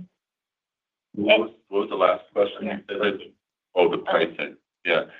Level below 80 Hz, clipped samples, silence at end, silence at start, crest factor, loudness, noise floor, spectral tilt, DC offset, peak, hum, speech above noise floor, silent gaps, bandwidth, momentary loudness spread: -74 dBFS; under 0.1%; 0.1 s; 0 s; 22 dB; -24 LUFS; -89 dBFS; -7 dB/octave; under 0.1%; -2 dBFS; none; 65 dB; none; 5 kHz; 12 LU